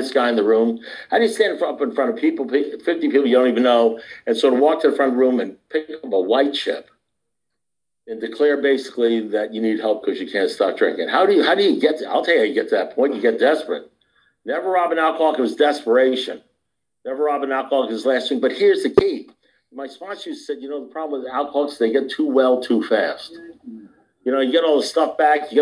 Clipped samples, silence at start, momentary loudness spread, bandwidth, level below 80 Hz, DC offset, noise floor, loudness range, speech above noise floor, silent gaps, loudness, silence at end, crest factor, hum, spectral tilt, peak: under 0.1%; 0 s; 14 LU; 10.5 kHz; -62 dBFS; under 0.1%; -84 dBFS; 5 LU; 65 dB; none; -19 LUFS; 0 s; 16 dB; none; -4.5 dB/octave; -2 dBFS